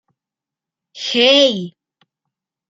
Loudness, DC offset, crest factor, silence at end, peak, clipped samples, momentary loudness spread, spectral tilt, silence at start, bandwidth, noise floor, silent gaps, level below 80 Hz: -13 LUFS; under 0.1%; 18 dB; 1 s; -2 dBFS; under 0.1%; 17 LU; -3 dB/octave; 0.95 s; 7.8 kHz; -87 dBFS; none; -72 dBFS